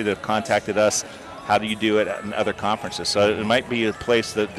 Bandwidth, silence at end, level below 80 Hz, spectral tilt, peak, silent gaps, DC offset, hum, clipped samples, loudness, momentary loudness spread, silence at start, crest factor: 14 kHz; 0 s; -54 dBFS; -3.5 dB/octave; -8 dBFS; none; under 0.1%; none; under 0.1%; -22 LUFS; 5 LU; 0 s; 16 dB